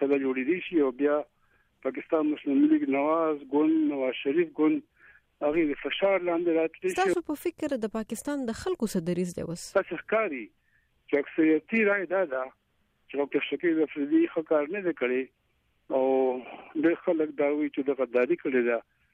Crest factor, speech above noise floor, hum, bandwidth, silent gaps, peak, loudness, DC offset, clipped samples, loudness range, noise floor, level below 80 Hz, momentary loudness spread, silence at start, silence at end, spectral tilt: 14 dB; 44 dB; none; 15 kHz; none; -12 dBFS; -28 LUFS; under 0.1%; under 0.1%; 4 LU; -71 dBFS; -64 dBFS; 8 LU; 0 s; 0.35 s; -5.5 dB/octave